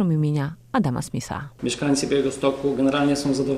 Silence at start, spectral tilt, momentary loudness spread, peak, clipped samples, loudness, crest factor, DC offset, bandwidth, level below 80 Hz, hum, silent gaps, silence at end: 0 s; -5.5 dB/octave; 8 LU; -8 dBFS; under 0.1%; -23 LUFS; 14 dB; under 0.1%; 14 kHz; -50 dBFS; none; none; 0 s